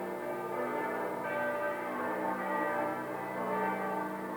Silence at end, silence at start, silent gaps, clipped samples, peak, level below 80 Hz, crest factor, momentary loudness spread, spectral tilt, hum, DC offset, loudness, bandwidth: 0 s; 0 s; none; under 0.1%; -20 dBFS; -80 dBFS; 14 dB; 4 LU; -6 dB/octave; none; under 0.1%; -35 LUFS; over 20 kHz